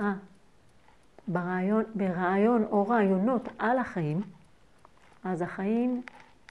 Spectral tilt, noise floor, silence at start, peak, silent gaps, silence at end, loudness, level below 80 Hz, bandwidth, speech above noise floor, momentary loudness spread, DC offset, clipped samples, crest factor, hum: -9 dB/octave; -62 dBFS; 0 s; -14 dBFS; none; 0.3 s; -28 LUFS; -66 dBFS; 9.6 kHz; 34 dB; 13 LU; under 0.1%; under 0.1%; 16 dB; none